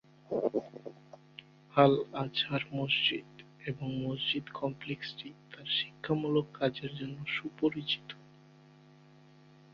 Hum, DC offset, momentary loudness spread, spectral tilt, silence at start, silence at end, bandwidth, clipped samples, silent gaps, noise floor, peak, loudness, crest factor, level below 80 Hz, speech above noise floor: none; under 0.1%; 20 LU; -7 dB/octave; 0.3 s; 1.5 s; 7 kHz; under 0.1%; none; -58 dBFS; -10 dBFS; -33 LUFS; 26 dB; -70 dBFS; 26 dB